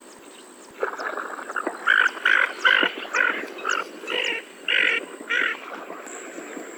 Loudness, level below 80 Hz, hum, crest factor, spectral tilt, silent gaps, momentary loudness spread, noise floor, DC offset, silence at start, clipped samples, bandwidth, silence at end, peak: -22 LUFS; -82 dBFS; none; 20 dB; -0.5 dB/octave; none; 18 LU; -45 dBFS; under 0.1%; 0 s; under 0.1%; over 20 kHz; 0 s; -4 dBFS